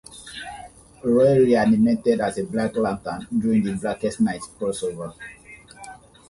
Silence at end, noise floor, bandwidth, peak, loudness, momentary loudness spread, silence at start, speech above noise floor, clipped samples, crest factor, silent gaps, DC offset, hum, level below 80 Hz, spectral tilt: 0.35 s; -44 dBFS; 11.5 kHz; -6 dBFS; -21 LUFS; 23 LU; 0.1 s; 23 dB; under 0.1%; 16 dB; none; under 0.1%; none; -52 dBFS; -6.5 dB/octave